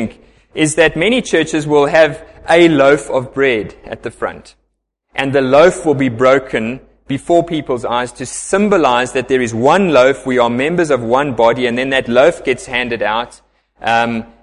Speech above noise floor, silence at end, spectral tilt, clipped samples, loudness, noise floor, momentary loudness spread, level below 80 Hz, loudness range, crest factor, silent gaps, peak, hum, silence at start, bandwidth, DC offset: 54 dB; 0.2 s; -5 dB/octave; under 0.1%; -13 LUFS; -67 dBFS; 14 LU; -44 dBFS; 3 LU; 14 dB; none; 0 dBFS; none; 0 s; 11.5 kHz; under 0.1%